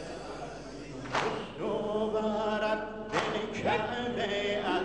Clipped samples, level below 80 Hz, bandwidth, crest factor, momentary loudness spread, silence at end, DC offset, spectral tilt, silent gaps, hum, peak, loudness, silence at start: under 0.1%; -56 dBFS; 10 kHz; 20 dB; 11 LU; 0 s; 0.1%; -5 dB/octave; none; none; -14 dBFS; -32 LUFS; 0 s